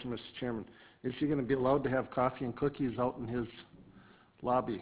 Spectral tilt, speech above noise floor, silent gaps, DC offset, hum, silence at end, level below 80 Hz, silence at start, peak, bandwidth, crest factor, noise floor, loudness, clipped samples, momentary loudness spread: -6 dB/octave; 26 dB; none; under 0.1%; none; 0 s; -60 dBFS; 0 s; -18 dBFS; 4 kHz; 18 dB; -60 dBFS; -35 LUFS; under 0.1%; 12 LU